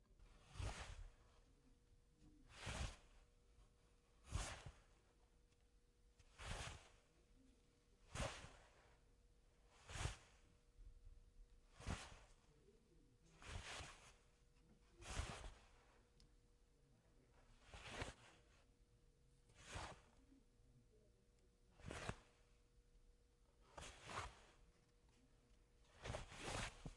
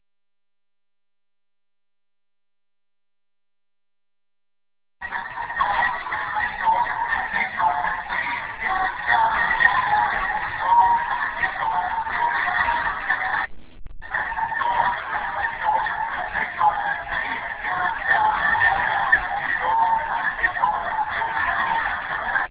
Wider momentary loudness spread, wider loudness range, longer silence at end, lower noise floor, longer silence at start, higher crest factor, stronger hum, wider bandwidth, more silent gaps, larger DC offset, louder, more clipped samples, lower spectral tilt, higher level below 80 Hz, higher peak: first, 15 LU vs 8 LU; about the same, 5 LU vs 5 LU; about the same, 0 s vs 0 s; second, -76 dBFS vs -88 dBFS; second, 0 s vs 5 s; first, 26 dB vs 20 dB; neither; first, 11.5 kHz vs 4 kHz; neither; neither; second, -54 LUFS vs -22 LUFS; neither; first, -3.5 dB/octave vs 0 dB/octave; second, -64 dBFS vs -48 dBFS; second, -32 dBFS vs -4 dBFS